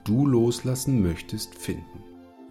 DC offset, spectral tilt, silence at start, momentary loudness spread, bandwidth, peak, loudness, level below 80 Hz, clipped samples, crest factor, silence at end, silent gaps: under 0.1%; -6.5 dB/octave; 0.05 s; 16 LU; 16 kHz; -10 dBFS; -25 LUFS; -48 dBFS; under 0.1%; 14 dB; 0 s; none